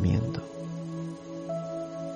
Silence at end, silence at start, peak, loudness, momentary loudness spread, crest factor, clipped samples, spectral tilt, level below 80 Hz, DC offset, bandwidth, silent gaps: 0 s; 0 s; -14 dBFS; -34 LUFS; 9 LU; 18 dB; under 0.1%; -8 dB/octave; -50 dBFS; under 0.1%; 9.6 kHz; none